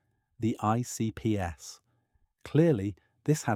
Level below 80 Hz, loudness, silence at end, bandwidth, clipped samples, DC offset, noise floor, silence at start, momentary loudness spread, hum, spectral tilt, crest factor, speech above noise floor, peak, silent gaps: -58 dBFS; -30 LUFS; 0 s; 16 kHz; under 0.1%; under 0.1%; -72 dBFS; 0.4 s; 12 LU; none; -6.5 dB/octave; 20 dB; 43 dB; -12 dBFS; none